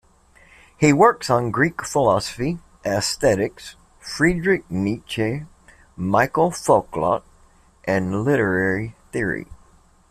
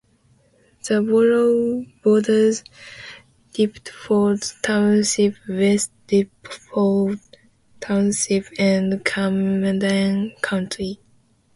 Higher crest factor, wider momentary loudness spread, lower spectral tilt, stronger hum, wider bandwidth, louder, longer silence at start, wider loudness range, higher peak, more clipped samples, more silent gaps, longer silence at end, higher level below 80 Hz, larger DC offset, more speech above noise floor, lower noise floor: about the same, 18 dB vs 18 dB; second, 12 LU vs 16 LU; about the same, -5.5 dB/octave vs -5 dB/octave; neither; first, 15 kHz vs 11.5 kHz; about the same, -21 LUFS vs -20 LUFS; about the same, 0.8 s vs 0.85 s; about the same, 3 LU vs 2 LU; about the same, -2 dBFS vs -2 dBFS; neither; neither; about the same, 0.55 s vs 0.6 s; first, -46 dBFS vs -58 dBFS; neither; second, 34 dB vs 40 dB; second, -53 dBFS vs -59 dBFS